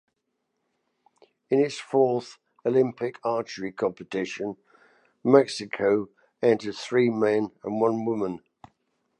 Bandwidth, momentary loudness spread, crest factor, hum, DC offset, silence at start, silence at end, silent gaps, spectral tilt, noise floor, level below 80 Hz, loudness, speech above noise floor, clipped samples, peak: 10.5 kHz; 12 LU; 22 dB; none; under 0.1%; 1.5 s; 0.85 s; none; -6 dB/octave; -78 dBFS; -70 dBFS; -26 LUFS; 54 dB; under 0.1%; -4 dBFS